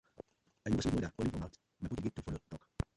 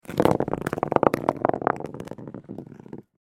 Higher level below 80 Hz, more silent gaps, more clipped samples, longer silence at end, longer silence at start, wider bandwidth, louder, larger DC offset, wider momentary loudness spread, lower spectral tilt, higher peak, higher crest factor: about the same, -52 dBFS vs -54 dBFS; neither; neither; about the same, 0.15 s vs 0.2 s; about the same, 0.2 s vs 0.1 s; second, 11.5 kHz vs 16.5 kHz; second, -39 LUFS vs -24 LUFS; neither; about the same, 20 LU vs 19 LU; about the same, -6.5 dB/octave vs -7 dB/octave; second, -20 dBFS vs 0 dBFS; second, 18 dB vs 26 dB